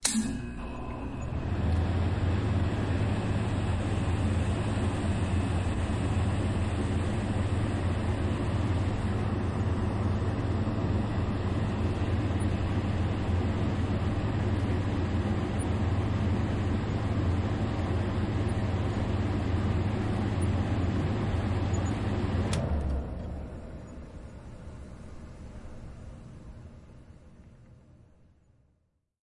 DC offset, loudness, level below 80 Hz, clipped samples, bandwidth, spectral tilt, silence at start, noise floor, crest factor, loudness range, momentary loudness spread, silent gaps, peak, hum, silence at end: under 0.1%; -30 LUFS; -40 dBFS; under 0.1%; 11.5 kHz; -6.5 dB/octave; 0 s; -74 dBFS; 20 dB; 14 LU; 16 LU; none; -8 dBFS; none; 1.55 s